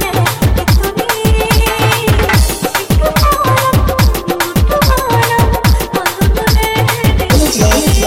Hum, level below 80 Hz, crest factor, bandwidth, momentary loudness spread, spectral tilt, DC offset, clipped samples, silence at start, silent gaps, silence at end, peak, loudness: none; -16 dBFS; 8 dB; 17 kHz; 3 LU; -4.5 dB/octave; 0.2%; under 0.1%; 0 s; none; 0 s; -2 dBFS; -12 LUFS